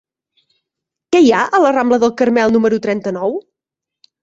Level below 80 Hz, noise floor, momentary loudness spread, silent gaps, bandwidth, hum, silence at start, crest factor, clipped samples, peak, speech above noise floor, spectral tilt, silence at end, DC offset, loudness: -56 dBFS; -84 dBFS; 9 LU; none; 7.8 kHz; none; 1.1 s; 14 dB; under 0.1%; -2 dBFS; 71 dB; -5.5 dB/octave; 0.8 s; under 0.1%; -14 LUFS